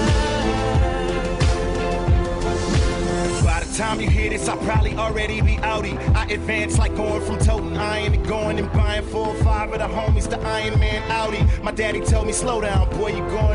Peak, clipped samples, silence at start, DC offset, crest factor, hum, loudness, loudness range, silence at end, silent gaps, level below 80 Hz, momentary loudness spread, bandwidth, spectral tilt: -8 dBFS; under 0.1%; 0 s; under 0.1%; 12 dB; none; -21 LUFS; 1 LU; 0 s; none; -24 dBFS; 3 LU; 11 kHz; -5.5 dB/octave